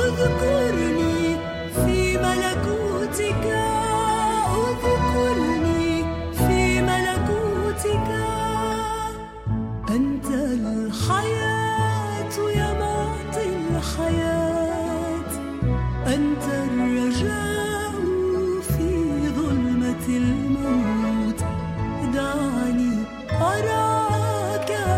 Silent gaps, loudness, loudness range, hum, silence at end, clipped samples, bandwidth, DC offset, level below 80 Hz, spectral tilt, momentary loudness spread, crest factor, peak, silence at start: none; -23 LUFS; 3 LU; none; 0 s; under 0.1%; 16 kHz; under 0.1%; -34 dBFS; -5.5 dB/octave; 6 LU; 14 dB; -8 dBFS; 0 s